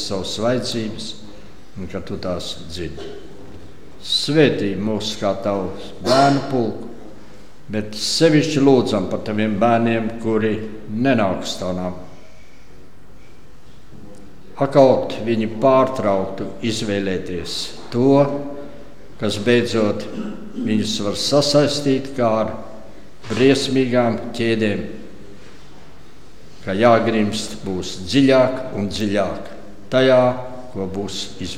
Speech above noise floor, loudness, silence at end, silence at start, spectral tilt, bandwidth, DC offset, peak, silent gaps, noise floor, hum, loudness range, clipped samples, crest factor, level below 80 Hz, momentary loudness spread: 28 dB; -19 LUFS; 0 s; 0 s; -5.5 dB/octave; 15.5 kHz; 3%; 0 dBFS; none; -46 dBFS; none; 6 LU; under 0.1%; 20 dB; -50 dBFS; 17 LU